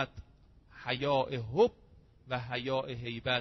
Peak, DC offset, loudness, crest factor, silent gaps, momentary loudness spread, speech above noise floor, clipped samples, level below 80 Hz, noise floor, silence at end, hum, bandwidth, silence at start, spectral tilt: -14 dBFS; under 0.1%; -33 LUFS; 20 dB; none; 10 LU; 28 dB; under 0.1%; -58 dBFS; -60 dBFS; 0 s; none; 6.2 kHz; 0 s; -3.5 dB/octave